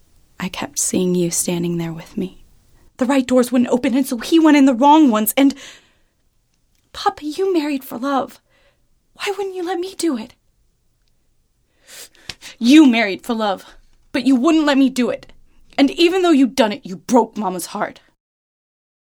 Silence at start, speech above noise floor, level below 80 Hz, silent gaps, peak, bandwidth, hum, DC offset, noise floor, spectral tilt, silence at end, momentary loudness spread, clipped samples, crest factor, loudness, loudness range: 0.4 s; 46 dB; -54 dBFS; none; 0 dBFS; 19.5 kHz; none; under 0.1%; -62 dBFS; -4.5 dB/octave; 1.1 s; 17 LU; under 0.1%; 18 dB; -17 LUFS; 11 LU